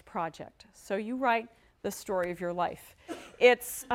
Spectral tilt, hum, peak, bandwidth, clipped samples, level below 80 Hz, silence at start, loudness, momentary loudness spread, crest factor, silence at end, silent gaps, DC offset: -3.5 dB/octave; none; -10 dBFS; 16.5 kHz; under 0.1%; -66 dBFS; 0.15 s; -30 LUFS; 23 LU; 22 dB; 0 s; none; under 0.1%